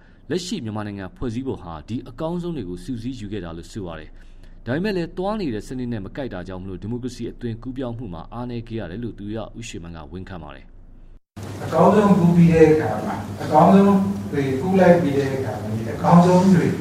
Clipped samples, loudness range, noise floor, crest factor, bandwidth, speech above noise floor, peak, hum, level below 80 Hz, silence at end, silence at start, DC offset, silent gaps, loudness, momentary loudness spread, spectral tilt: under 0.1%; 15 LU; -44 dBFS; 20 dB; 12 kHz; 24 dB; -2 dBFS; none; -42 dBFS; 0 s; 0.25 s; under 0.1%; none; -20 LUFS; 19 LU; -7.5 dB/octave